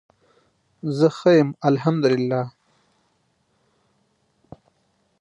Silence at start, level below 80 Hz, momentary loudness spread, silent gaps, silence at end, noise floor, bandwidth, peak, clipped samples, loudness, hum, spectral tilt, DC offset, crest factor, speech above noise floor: 0.85 s; -68 dBFS; 12 LU; none; 2.7 s; -67 dBFS; 9.8 kHz; -4 dBFS; under 0.1%; -20 LUFS; none; -7.5 dB/octave; under 0.1%; 20 dB; 48 dB